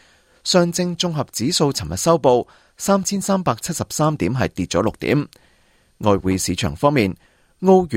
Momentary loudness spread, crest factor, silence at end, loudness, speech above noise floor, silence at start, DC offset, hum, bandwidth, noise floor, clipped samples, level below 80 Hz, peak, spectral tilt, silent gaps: 7 LU; 18 dB; 0 s; -19 LUFS; 39 dB; 0.45 s; under 0.1%; none; 16.5 kHz; -57 dBFS; under 0.1%; -48 dBFS; -2 dBFS; -5 dB/octave; none